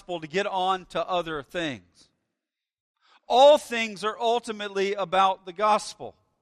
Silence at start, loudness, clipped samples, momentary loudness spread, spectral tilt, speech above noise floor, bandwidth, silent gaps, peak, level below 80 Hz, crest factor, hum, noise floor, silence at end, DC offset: 0.1 s; -24 LUFS; under 0.1%; 15 LU; -3.5 dB/octave; 62 dB; 13.5 kHz; 2.80-2.94 s; -6 dBFS; -64 dBFS; 20 dB; none; -87 dBFS; 0.3 s; under 0.1%